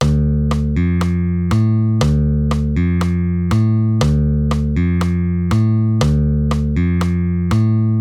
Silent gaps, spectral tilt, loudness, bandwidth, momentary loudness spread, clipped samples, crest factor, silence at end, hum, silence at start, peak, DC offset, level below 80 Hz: none; -8 dB/octave; -16 LUFS; 11.5 kHz; 2 LU; under 0.1%; 12 dB; 0 s; none; 0 s; -2 dBFS; under 0.1%; -24 dBFS